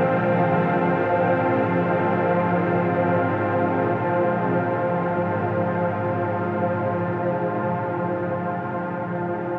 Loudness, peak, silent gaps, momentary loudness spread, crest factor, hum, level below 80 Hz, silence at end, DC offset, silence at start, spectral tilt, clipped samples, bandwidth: -23 LUFS; -8 dBFS; none; 5 LU; 14 dB; none; -58 dBFS; 0 s; under 0.1%; 0 s; -10 dB/octave; under 0.1%; 5 kHz